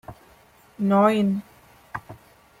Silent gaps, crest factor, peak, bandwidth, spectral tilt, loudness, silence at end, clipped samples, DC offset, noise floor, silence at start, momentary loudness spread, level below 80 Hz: none; 20 dB; -6 dBFS; 15 kHz; -7.5 dB/octave; -21 LUFS; 0.45 s; under 0.1%; under 0.1%; -54 dBFS; 0.1 s; 20 LU; -60 dBFS